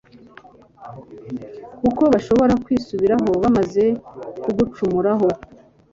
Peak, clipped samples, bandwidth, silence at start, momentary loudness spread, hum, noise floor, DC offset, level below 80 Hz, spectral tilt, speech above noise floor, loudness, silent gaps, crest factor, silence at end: -2 dBFS; under 0.1%; 7.6 kHz; 0.8 s; 19 LU; none; -46 dBFS; under 0.1%; -46 dBFS; -8 dB/octave; 28 dB; -19 LUFS; none; 18 dB; 0.55 s